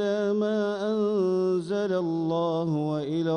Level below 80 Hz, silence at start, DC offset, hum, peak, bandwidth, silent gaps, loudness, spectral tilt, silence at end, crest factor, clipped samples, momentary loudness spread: -68 dBFS; 0 s; under 0.1%; none; -16 dBFS; 9.8 kHz; none; -26 LUFS; -7.5 dB/octave; 0 s; 10 dB; under 0.1%; 3 LU